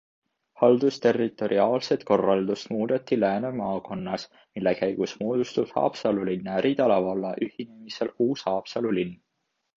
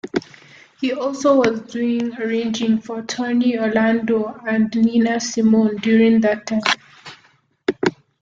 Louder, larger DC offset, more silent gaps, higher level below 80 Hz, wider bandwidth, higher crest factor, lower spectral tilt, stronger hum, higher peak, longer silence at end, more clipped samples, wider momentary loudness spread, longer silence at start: second, -26 LUFS vs -19 LUFS; neither; neither; second, -66 dBFS vs -60 dBFS; about the same, 7.6 kHz vs 7.6 kHz; about the same, 20 dB vs 18 dB; first, -6.5 dB/octave vs -5 dB/octave; neither; second, -6 dBFS vs -2 dBFS; first, 0.65 s vs 0.3 s; neither; about the same, 10 LU vs 9 LU; first, 0.6 s vs 0.05 s